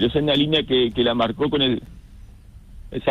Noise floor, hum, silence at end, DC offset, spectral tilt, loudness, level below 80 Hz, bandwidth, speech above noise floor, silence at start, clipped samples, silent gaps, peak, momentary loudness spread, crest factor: -43 dBFS; none; 0 s; under 0.1%; -7 dB/octave; -20 LUFS; -42 dBFS; 10 kHz; 23 dB; 0 s; under 0.1%; none; -6 dBFS; 8 LU; 16 dB